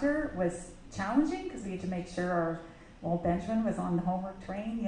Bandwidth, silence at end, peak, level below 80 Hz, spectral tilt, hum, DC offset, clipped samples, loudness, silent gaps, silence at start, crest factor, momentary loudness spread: 10 kHz; 0 s; -16 dBFS; -52 dBFS; -7 dB/octave; none; under 0.1%; under 0.1%; -33 LUFS; none; 0 s; 18 dB; 11 LU